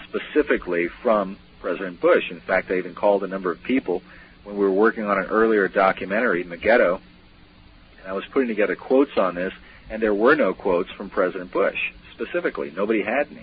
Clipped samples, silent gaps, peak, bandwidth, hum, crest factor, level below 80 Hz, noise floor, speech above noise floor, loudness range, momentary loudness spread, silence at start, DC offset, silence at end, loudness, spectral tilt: under 0.1%; none; -6 dBFS; 5.2 kHz; none; 16 dB; -52 dBFS; -50 dBFS; 28 dB; 3 LU; 11 LU; 0 s; under 0.1%; 0 s; -22 LUFS; -10.5 dB/octave